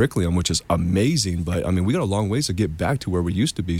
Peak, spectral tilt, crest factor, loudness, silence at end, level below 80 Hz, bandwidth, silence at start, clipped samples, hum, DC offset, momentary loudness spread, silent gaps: -6 dBFS; -5.5 dB/octave; 14 dB; -22 LUFS; 0 s; -38 dBFS; 16 kHz; 0 s; under 0.1%; none; under 0.1%; 4 LU; none